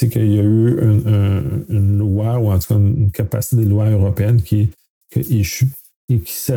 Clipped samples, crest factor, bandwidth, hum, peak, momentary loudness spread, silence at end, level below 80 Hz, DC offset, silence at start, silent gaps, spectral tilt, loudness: under 0.1%; 12 dB; 18.5 kHz; none; -4 dBFS; 6 LU; 0 s; -38 dBFS; under 0.1%; 0 s; 4.90-5.01 s, 5.96-6.08 s; -7.5 dB/octave; -16 LUFS